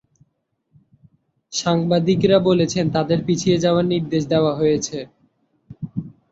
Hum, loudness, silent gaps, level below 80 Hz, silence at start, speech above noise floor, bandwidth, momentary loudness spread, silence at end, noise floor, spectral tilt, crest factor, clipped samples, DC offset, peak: none; -19 LUFS; none; -54 dBFS; 1.5 s; 53 dB; 8 kHz; 15 LU; 0.2 s; -71 dBFS; -6 dB/octave; 18 dB; under 0.1%; under 0.1%; -2 dBFS